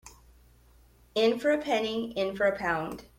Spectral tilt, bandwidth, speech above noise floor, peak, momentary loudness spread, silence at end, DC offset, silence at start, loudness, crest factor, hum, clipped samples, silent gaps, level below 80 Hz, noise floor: -4.5 dB/octave; 16.5 kHz; 31 dB; -14 dBFS; 7 LU; 0.15 s; under 0.1%; 0.05 s; -28 LUFS; 16 dB; none; under 0.1%; none; -58 dBFS; -59 dBFS